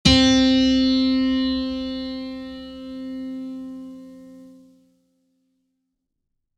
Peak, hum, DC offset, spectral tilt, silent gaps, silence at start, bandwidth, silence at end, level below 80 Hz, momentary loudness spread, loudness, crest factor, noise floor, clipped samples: -2 dBFS; none; under 0.1%; -4.5 dB/octave; none; 0.05 s; 9.8 kHz; 2.05 s; -40 dBFS; 21 LU; -20 LUFS; 22 dB; -77 dBFS; under 0.1%